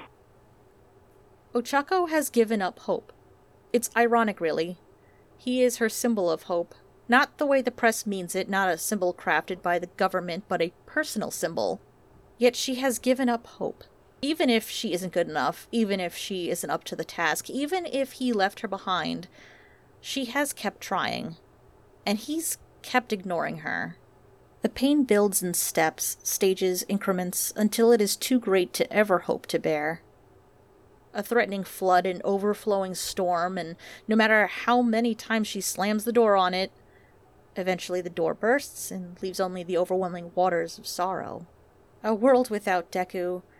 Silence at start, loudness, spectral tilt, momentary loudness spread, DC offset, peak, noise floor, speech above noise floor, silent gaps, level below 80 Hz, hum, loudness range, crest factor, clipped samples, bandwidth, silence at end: 0 s; -26 LUFS; -3.5 dB/octave; 11 LU; under 0.1%; -6 dBFS; -57 dBFS; 31 dB; none; -64 dBFS; none; 5 LU; 20 dB; under 0.1%; 18 kHz; 0.2 s